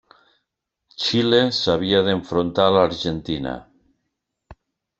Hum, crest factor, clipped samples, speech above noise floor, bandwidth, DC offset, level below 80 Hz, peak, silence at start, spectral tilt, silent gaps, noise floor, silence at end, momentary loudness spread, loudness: none; 20 dB; under 0.1%; 60 dB; 7.8 kHz; under 0.1%; -52 dBFS; -2 dBFS; 1 s; -5.5 dB/octave; none; -79 dBFS; 0.45 s; 10 LU; -20 LUFS